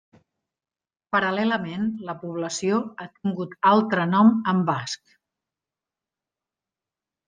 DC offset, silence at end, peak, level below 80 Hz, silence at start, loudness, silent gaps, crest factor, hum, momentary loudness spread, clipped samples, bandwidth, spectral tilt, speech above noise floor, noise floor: under 0.1%; 2.3 s; -4 dBFS; -70 dBFS; 1.15 s; -23 LUFS; none; 20 dB; none; 14 LU; under 0.1%; 9.6 kHz; -5.5 dB/octave; over 67 dB; under -90 dBFS